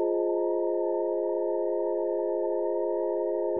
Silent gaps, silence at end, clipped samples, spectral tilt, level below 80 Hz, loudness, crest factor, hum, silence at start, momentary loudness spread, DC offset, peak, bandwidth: none; 0 s; under 0.1%; -2.5 dB/octave; -84 dBFS; -28 LUFS; 10 dB; none; 0 s; 1 LU; 0.3%; -18 dBFS; 2 kHz